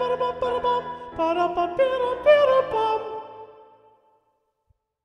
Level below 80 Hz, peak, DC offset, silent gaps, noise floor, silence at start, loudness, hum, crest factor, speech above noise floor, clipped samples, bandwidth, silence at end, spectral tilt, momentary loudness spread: -56 dBFS; -6 dBFS; under 0.1%; none; -71 dBFS; 0 s; -22 LUFS; none; 18 dB; 50 dB; under 0.1%; 9.4 kHz; 1.55 s; -5.5 dB/octave; 16 LU